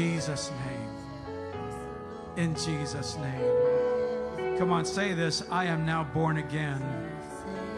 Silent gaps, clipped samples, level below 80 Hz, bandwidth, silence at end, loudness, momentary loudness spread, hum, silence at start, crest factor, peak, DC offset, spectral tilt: none; under 0.1%; -56 dBFS; 12 kHz; 0 s; -31 LUFS; 12 LU; none; 0 s; 16 dB; -14 dBFS; under 0.1%; -5.5 dB/octave